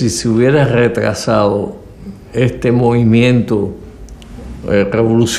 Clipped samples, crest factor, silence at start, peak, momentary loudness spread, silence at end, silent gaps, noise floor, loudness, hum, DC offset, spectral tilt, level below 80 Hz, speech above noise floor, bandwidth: under 0.1%; 12 dB; 0 s; -2 dBFS; 21 LU; 0 s; none; -32 dBFS; -13 LUFS; none; under 0.1%; -6 dB/octave; -36 dBFS; 20 dB; 13.5 kHz